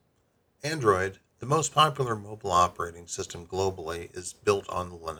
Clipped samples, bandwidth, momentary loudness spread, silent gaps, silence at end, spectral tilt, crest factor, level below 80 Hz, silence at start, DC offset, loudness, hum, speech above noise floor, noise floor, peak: under 0.1%; 18.5 kHz; 13 LU; none; 0 s; -4 dB/octave; 20 dB; -58 dBFS; 0.65 s; under 0.1%; -28 LUFS; none; 42 dB; -70 dBFS; -8 dBFS